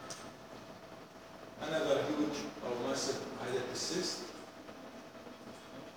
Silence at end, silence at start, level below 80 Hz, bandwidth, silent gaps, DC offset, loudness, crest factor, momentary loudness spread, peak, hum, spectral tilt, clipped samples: 0 s; 0 s; -72 dBFS; over 20 kHz; none; under 0.1%; -37 LUFS; 22 dB; 18 LU; -18 dBFS; none; -3.5 dB/octave; under 0.1%